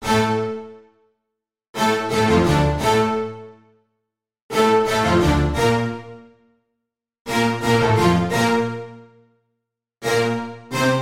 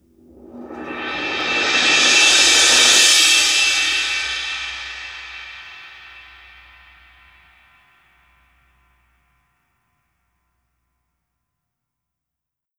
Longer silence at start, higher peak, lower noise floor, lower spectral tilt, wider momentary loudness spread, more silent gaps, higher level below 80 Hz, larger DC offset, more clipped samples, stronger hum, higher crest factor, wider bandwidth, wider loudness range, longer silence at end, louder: second, 0 s vs 0.55 s; second, -4 dBFS vs 0 dBFS; about the same, -81 dBFS vs -84 dBFS; first, -5.5 dB/octave vs 1.5 dB/octave; second, 14 LU vs 24 LU; first, 1.69-1.74 s, 4.42-4.49 s, 7.20-7.25 s vs none; first, -36 dBFS vs -54 dBFS; neither; neither; neither; about the same, 16 dB vs 20 dB; second, 16.5 kHz vs over 20 kHz; second, 1 LU vs 20 LU; second, 0 s vs 6.6 s; second, -19 LUFS vs -13 LUFS